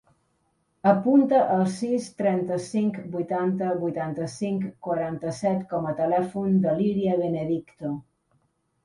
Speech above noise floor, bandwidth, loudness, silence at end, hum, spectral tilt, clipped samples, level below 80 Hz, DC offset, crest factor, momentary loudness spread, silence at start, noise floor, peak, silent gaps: 46 dB; 11.5 kHz; -25 LUFS; 0.85 s; none; -7.5 dB/octave; under 0.1%; -64 dBFS; under 0.1%; 20 dB; 10 LU; 0.85 s; -71 dBFS; -6 dBFS; none